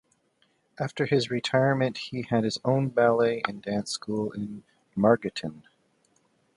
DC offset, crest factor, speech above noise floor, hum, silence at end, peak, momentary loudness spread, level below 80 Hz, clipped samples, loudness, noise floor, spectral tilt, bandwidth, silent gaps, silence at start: under 0.1%; 22 dB; 43 dB; none; 0.95 s; -6 dBFS; 13 LU; -64 dBFS; under 0.1%; -26 LUFS; -69 dBFS; -6 dB/octave; 11.5 kHz; none; 0.8 s